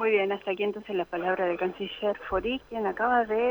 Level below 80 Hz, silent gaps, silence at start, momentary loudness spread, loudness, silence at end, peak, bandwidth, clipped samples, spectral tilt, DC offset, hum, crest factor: -54 dBFS; none; 0 s; 7 LU; -28 LUFS; 0 s; -12 dBFS; 19.5 kHz; under 0.1%; -6.5 dB/octave; under 0.1%; none; 16 dB